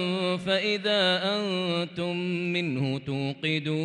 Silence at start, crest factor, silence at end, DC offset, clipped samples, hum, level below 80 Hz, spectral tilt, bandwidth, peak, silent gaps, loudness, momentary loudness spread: 0 s; 14 dB; 0 s; under 0.1%; under 0.1%; none; -68 dBFS; -5.5 dB/octave; 10.5 kHz; -14 dBFS; none; -27 LUFS; 7 LU